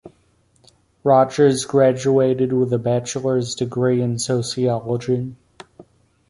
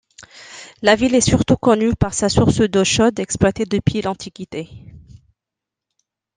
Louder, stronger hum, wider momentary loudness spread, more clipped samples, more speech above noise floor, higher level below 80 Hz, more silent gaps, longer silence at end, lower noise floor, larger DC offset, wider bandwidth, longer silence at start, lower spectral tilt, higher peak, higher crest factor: about the same, -19 LUFS vs -17 LUFS; neither; second, 7 LU vs 16 LU; neither; second, 41 dB vs 68 dB; second, -56 dBFS vs -38 dBFS; neither; second, 0.45 s vs 1.4 s; second, -60 dBFS vs -85 dBFS; neither; first, 11.5 kHz vs 10 kHz; second, 0.05 s vs 0.2 s; about the same, -6 dB/octave vs -5 dB/octave; about the same, -2 dBFS vs -2 dBFS; about the same, 16 dB vs 18 dB